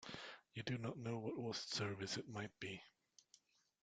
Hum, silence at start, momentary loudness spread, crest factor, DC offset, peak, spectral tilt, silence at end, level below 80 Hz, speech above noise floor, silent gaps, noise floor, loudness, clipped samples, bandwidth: none; 0 s; 9 LU; 22 dB; under 0.1%; -26 dBFS; -4.5 dB/octave; 0.95 s; -80 dBFS; 28 dB; none; -75 dBFS; -47 LUFS; under 0.1%; 9.4 kHz